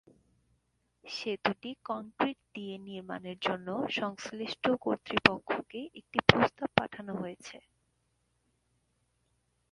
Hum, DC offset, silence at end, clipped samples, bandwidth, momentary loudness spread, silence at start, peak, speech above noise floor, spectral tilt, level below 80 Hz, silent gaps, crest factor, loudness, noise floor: none; under 0.1%; 2.15 s; under 0.1%; 11.5 kHz; 16 LU; 1.05 s; 0 dBFS; 44 dB; -5 dB/octave; -60 dBFS; none; 34 dB; -32 LUFS; -76 dBFS